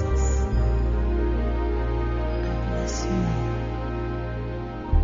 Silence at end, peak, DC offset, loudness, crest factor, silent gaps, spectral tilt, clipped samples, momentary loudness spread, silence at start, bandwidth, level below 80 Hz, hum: 0 s; -8 dBFS; under 0.1%; -26 LUFS; 16 dB; none; -7.5 dB/octave; under 0.1%; 6 LU; 0 s; 7.4 kHz; -26 dBFS; none